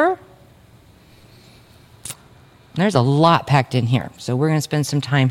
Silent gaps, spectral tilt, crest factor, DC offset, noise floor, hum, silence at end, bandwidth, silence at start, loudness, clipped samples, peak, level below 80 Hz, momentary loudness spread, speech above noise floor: none; -6 dB/octave; 18 dB; under 0.1%; -49 dBFS; none; 0 s; 16 kHz; 0 s; -18 LUFS; under 0.1%; -2 dBFS; -56 dBFS; 19 LU; 31 dB